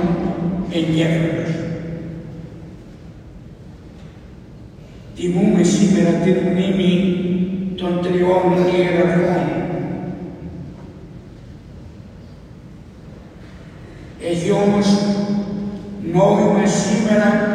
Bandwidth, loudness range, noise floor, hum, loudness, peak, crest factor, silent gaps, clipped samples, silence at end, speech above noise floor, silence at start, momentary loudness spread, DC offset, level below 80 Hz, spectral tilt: 10.5 kHz; 19 LU; -38 dBFS; none; -18 LUFS; -2 dBFS; 16 dB; none; under 0.1%; 0 s; 23 dB; 0 s; 24 LU; under 0.1%; -44 dBFS; -6.5 dB/octave